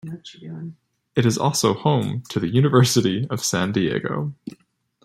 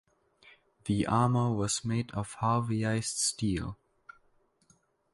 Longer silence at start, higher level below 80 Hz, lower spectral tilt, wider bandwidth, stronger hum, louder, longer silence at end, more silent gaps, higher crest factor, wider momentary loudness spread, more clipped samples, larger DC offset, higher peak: second, 0.05 s vs 0.45 s; about the same, -58 dBFS vs -54 dBFS; about the same, -5 dB/octave vs -5 dB/octave; first, 15.5 kHz vs 11.5 kHz; neither; first, -21 LUFS vs -30 LUFS; second, 0.5 s vs 1.4 s; neither; about the same, 18 dB vs 18 dB; first, 20 LU vs 10 LU; neither; neither; first, -2 dBFS vs -14 dBFS